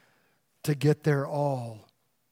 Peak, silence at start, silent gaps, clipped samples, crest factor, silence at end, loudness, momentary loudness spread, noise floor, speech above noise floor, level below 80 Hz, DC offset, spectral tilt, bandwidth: -12 dBFS; 0.65 s; none; under 0.1%; 18 dB; 0.5 s; -28 LUFS; 11 LU; -70 dBFS; 43 dB; -70 dBFS; under 0.1%; -7 dB/octave; 16 kHz